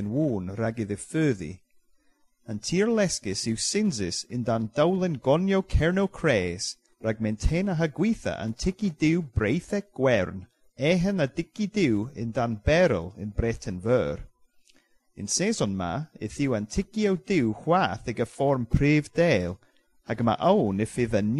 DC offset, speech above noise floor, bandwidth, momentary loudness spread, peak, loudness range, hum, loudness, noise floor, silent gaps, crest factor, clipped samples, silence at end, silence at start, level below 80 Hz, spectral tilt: under 0.1%; 40 dB; 12 kHz; 9 LU; -8 dBFS; 3 LU; none; -26 LUFS; -66 dBFS; none; 18 dB; under 0.1%; 0 s; 0 s; -40 dBFS; -5.5 dB/octave